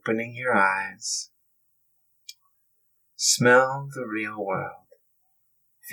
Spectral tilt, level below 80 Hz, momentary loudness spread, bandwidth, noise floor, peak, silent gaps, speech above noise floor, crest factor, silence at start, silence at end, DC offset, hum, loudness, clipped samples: -2.5 dB/octave; -82 dBFS; 14 LU; 19 kHz; -69 dBFS; -6 dBFS; none; 45 dB; 22 dB; 0.05 s; 0 s; under 0.1%; none; -23 LUFS; under 0.1%